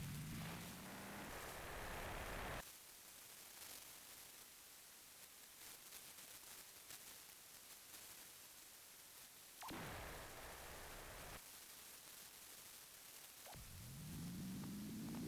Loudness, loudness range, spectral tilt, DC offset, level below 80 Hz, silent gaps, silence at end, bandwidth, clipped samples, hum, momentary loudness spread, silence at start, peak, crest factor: -54 LUFS; 5 LU; -3.5 dB/octave; under 0.1%; -66 dBFS; none; 0 s; 16 kHz; under 0.1%; none; 8 LU; 0 s; -36 dBFS; 18 dB